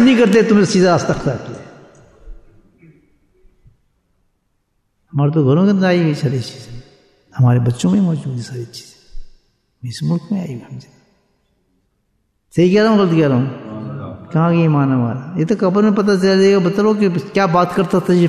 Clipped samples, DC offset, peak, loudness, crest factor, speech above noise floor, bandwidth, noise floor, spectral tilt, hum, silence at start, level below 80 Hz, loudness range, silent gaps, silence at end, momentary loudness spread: under 0.1%; under 0.1%; -2 dBFS; -15 LUFS; 14 dB; 52 dB; 12 kHz; -66 dBFS; -7 dB/octave; none; 0 s; -46 dBFS; 13 LU; none; 0 s; 18 LU